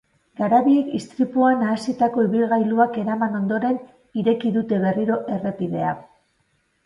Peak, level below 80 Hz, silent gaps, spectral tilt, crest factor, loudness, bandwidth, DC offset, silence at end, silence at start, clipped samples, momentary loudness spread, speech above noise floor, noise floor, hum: -4 dBFS; -64 dBFS; none; -7.5 dB/octave; 16 dB; -21 LUFS; 11 kHz; under 0.1%; 0.85 s; 0.4 s; under 0.1%; 8 LU; 47 dB; -67 dBFS; none